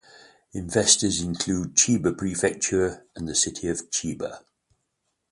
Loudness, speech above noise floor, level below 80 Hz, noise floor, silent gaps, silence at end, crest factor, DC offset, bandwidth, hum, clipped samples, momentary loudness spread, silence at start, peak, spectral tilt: -23 LUFS; 52 dB; -50 dBFS; -77 dBFS; none; 0.9 s; 22 dB; under 0.1%; 11.5 kHz; none; under 0.1%; 16 LU; 0.55 s; -4 dBFS; -3 dB/octave